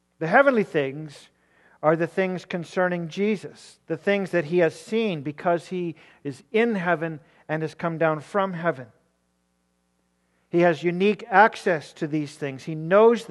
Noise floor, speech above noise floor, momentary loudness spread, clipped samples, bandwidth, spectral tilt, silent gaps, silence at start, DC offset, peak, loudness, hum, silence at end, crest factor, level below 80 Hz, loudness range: -71 dBFS; 47 dB; 15 LU; under 0.1%; 12 kHz; -6.5 dB/octave; none; 0.2 s; under 0.1%; -2 dBFS; -24 LUFS; none; 0.05 s; 22 dB; -76 dBFS; 4 LU